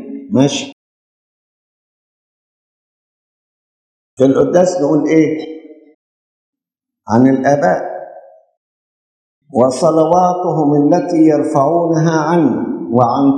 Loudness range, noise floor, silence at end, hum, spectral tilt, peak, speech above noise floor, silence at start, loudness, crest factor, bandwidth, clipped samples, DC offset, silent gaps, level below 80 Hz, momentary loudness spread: 6 LU; -83 dBFS; 0 s; none; -6.5 dB/octave; 0 dBFS; 71 dB; 0 s; -13 LUFS; 14 dB; 9.8 kHz; under 0.1%; under 0.1%; 0.73-4.17 s, 5.94-6.53 s, 8.57-9.42 s; -60 dBFS; 9 LU